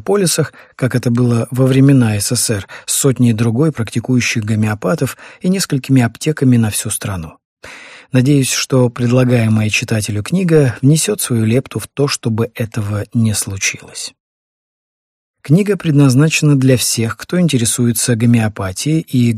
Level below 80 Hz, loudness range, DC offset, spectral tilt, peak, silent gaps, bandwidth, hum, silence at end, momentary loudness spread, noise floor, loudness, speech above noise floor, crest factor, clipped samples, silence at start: -48 dBFS; 5 LU; under 0.1%; -5 dB/octave; 0 dBFS; 7.45-7.57 s, 14.20-15.34 s; 15.5 kHz; none; 0 s; 9 LU; -36 dBFS; -14 LUFS; 22 dB; 14 dB; under 0.1%; 0.05 s